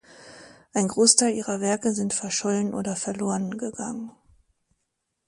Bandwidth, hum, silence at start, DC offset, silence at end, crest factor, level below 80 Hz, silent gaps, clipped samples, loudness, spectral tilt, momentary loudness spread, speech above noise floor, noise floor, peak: 11.5 kHz; none; 0.1 s; under 0.1%; 1.2 s; 24 dB; -64 dBFS; none; under 0.1%; -24 LUFS; -3.5 dB/octave; 15 LU; 54 dB; -78 dBFS; -2 dBFS